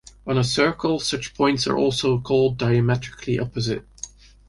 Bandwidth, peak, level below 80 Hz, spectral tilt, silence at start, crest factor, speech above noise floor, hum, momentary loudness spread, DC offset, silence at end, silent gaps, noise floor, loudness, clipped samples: 11.5 kHz; -6 dBFS; -48 dBFS; -5.5 dB/octave; 0.25 s; 16 dB; 20 dB; none; 7 LU; under 0.1%; 0.4 s; none; -41 dBFS; -22 LUFS; under 0.1%